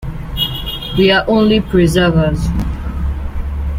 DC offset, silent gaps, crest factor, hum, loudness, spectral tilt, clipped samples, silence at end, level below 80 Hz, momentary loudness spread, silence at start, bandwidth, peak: under 0.1%; none; 14 dB; none; -15 LUFS; -6 dB/octave; under 0.1%; 0 s; -22 dBFS; 11 LU; 0 s; 16.5 kHz; 0 dBFS